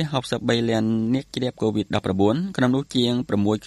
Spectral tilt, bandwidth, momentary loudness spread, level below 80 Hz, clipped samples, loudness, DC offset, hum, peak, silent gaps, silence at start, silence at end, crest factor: -6.5 dB/octave; 12 kHz; 4 LU; -54 dBFS; under 0.1%; -23 LUFS; under 0.1%; none; -6 dBFS; none; 0 s; 0 s; 16 dB